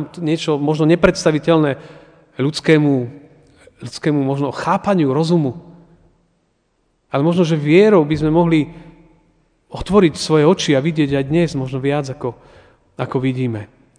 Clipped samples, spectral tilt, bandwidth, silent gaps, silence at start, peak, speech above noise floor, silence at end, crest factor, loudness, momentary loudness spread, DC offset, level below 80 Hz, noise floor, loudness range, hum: under 0.1%; -6.5 dB/octave; 10 kHz; none; 0 s; 0 dBFS; 48 dB; 0.3 s; 18 dB; -16 LUFS; 14 LU; under 0.1%; -44 dBFS; -64 dBFS; 4 LU; none